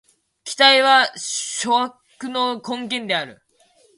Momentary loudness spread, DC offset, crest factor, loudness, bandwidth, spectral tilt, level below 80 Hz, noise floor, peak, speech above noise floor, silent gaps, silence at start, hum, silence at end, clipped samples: 18 LU; under 0.1%; 20 dB; -18 LUFS; 11.5 kHz; -1 dB/octave; -72 dBFS; -58 dBFS; 0 dBFS; 39 dB; none; 0.45 s; none; 0.65 s; under 0.1%